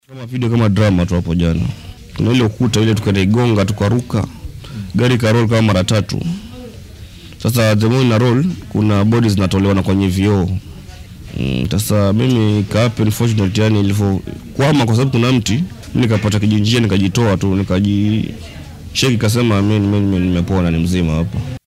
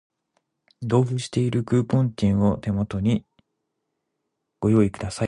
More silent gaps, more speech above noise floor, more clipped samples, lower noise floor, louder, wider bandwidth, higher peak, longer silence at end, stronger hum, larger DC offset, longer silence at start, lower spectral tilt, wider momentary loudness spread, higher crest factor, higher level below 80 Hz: neither; second, 20 dB vs 57 dB; neither; second, -34 dBFS vs -79 dBFS; first, -15 LUFS vs -23 LUFS; first, 15.5 kHz vs 11 kHz; first, 0 dBFS vs -6 dBFS; about the same, 0.1 s vs 0 s; neither; neither; second, 0.1 s vs 0.8 s; about the same, -6.5 dB/octave vs -7.5 dB/octave; first, 13 LU vs 6 LU; about the same, 14 dB vs 18 dB; first, -36 dBFS vs -46 dBFS